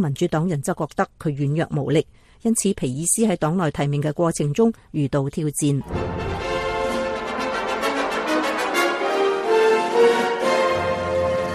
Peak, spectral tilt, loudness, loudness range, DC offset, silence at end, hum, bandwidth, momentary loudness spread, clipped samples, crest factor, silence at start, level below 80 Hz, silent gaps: -6 dBFS; -5 dB/octave; -22 LUFS; 4 LU; under 0.1%; 0 s; none; 15 kHz; 7 LU; under 0.1%; 16 dB; 0 s; -46 dBFS; none